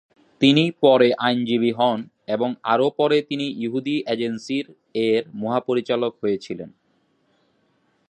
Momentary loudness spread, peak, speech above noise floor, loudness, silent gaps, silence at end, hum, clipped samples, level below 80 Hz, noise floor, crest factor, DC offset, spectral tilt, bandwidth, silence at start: 11 LU; -2 dBFS; 45 dB; -21 LUFS; none; 1.4 s; none; under 0.1%; -68 dBFS; -65 dBFS; 20 dB; under 0.1%; -6 dB/octave; 9.8 kHz; 0.4 s